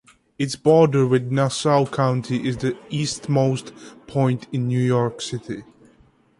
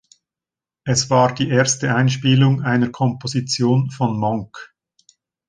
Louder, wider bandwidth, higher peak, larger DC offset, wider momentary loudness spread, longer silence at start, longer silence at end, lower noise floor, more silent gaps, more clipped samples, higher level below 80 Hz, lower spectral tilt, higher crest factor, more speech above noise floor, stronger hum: second, -21 LUFS vs -18 LUFS; first, 11.5 kHz vs 10 kHz; about the same, -4 dBFS vs -2 dBFS; neither; first, 13 LU vs 9 LU; second, 0.4 s vs 0.85 s; about the same, 0.75 s vs 0.85 s; second, -56 dBFS vs -89 dBFS; neither; neither; about the same, -56 dBFS vs -54 dBFS; first, -6.5 dB/octave vs -5 dB/octave; about the same, 18 dB vs 18 dB; second, 36 dB vs 72 dB; neither